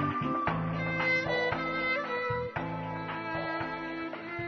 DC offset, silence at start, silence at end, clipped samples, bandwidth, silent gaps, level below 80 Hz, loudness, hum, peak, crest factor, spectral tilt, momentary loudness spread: under 0.1%; 0 s; 0 s; under 0.1%; 6.6 kHz; none; -56 dBFS; -32 LUFS; none; -18 dBFS; 16 dB; -7 dB/octave; 9 LU